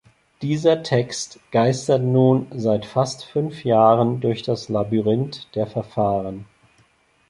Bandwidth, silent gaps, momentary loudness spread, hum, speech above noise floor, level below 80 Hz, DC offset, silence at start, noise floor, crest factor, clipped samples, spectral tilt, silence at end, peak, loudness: 11.5 kHz; none; 10 LU; none; 40 dB; -56 dBFS; under 0.1%; 0.4 s; -60 dBFS; 18 dB; under 0.1%; -6.5 dB/octave; 0.85 s; -2 dBFS; -21 LUFS